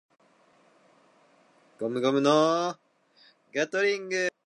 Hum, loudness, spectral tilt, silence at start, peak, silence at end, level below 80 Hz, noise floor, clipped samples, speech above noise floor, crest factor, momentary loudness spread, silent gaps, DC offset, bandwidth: none; -26 LUFS; -4.5 dB/octave; 1.8 s; -8 dBFS; 0.15 s; -84 dBFS; -62 dBFS; under 0.1%; 37 dB; 20 dB; 13 LU; none; under 0.1%; 11 kHz